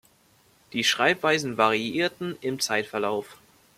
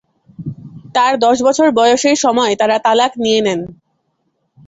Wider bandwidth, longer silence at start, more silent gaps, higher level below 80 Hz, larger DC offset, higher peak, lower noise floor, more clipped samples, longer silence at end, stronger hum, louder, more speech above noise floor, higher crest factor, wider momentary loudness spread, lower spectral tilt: first, 16 kHz vs 8.2 kHz; first, 0.75 s vs 0.4 s; neither; second, -68 dBFS vs -56 dBFS; neither; second, -6 dBFS vs 0 dBFS; second, -61 dBFS vs -66 dBFS; neither; second, 0.45 s vs 0.95 s; neither; second, -25 LUFS vs -13 LUFS; second, 36 dB vs 53 dB; first, 20 dB vs 14 dB; second, 10 LU vs 18 LU; about the same, -3 dB/octave vs -3.5 dB/octave